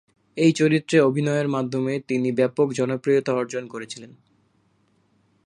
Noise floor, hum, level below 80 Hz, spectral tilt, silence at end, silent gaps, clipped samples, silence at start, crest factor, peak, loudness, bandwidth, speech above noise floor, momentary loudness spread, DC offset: -64 dBFS; none; -70 dBFS; -6 dB/octave; 1.4 s; none; under 0.1%; 0.35 s; 18 dB; -4 dBFS; -22 LUFS; 11 kHz; 43 dB; 16 LU; under 0.1%